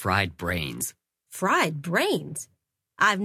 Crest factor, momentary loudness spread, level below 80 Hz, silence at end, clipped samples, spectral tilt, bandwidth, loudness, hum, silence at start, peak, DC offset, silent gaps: 20 dB; 14 LU; -48 dBFS; 0 s; under 0.1%; -4 dB/octave; 16 kHz; -26 LUFS; none; 0 s; -6 dBFS; under 0.1%; none